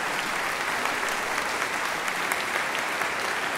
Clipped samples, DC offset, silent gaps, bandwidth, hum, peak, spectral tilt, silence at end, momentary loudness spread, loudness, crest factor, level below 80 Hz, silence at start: under 0.1%; under 0.1%; none; 16 kHz; none; -6 dBFS; -1 dB/octave; 0 s; 1 LU; -26 LUFS; 22 dB; -60 dBFS; 0 s